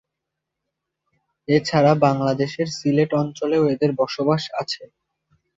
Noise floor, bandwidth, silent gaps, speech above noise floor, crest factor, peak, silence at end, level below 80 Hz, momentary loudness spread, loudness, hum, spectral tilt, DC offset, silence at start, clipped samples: -82 dBFS; 7.8 kHz; none; 62 dB; 18 dB; -4 dBFS; 0.75 s; -62 dBFS; 10 LU; -20 LUFS; none; -6.5 dB/octave; under 0.1%; 1.5 s; under 0.1%